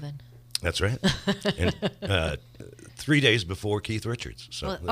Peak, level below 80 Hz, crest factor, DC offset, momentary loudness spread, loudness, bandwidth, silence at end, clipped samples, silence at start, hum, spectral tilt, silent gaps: -6 dBFS; -44 dBFS; 22 dB; under 0.1%; 17 LU; -27 LUFS; 15.5 kHz; 0 s; under 0.1%; 0 s; none; -5 dB/octave; none